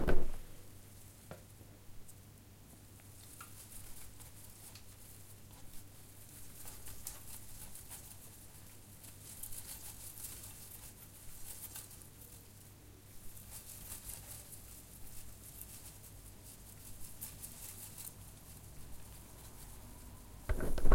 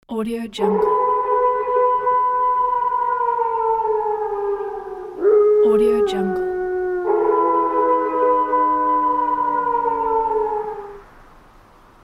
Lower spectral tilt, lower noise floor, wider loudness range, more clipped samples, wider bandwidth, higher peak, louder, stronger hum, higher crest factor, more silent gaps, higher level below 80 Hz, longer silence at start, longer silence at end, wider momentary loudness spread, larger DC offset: second, -4 dB/octave vs -6.5 dB/octave; first, -57 dBFS vs -48 dBFS; first, 6 LU vs 2 LU; neither; first, 16.5 kHz vs 11.5 kHz; second, -14 dBFS vs -6 dBFS; second, -50 LUFS vs -19 LUFS; neither; first, 24 dB vs 14 dB; neither; about the same, -46 dBFS vs -50 dBFS; about the same, 0 s vs 0.1 s; second, 0 s vs 0.8 s; about the same, 10 LU vs 9 LU; neither